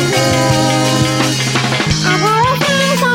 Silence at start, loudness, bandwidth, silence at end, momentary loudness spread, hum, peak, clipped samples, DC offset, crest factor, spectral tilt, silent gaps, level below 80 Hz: 0 s; -12 LUFS; 16.5 kHz; 0 s; 2 LU; none; 0 dBFS; under 0.1%; under 0.1%; 12 dB; -4 dB/octave; none; -36 dBFS